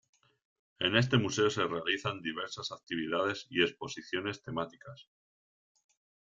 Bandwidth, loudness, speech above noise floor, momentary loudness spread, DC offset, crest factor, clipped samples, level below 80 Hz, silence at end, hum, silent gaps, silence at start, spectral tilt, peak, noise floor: 7.8 kHz; -33 LUFS; over 57 dB; 12 LU; under 0.1%; 26 dB; under 0.1%; -70 dBFS; 1.3 s; none; 2.83-2.87 s; 0.8 s; -4.5 dB/octave; -8 dBFS; under -90 dBFS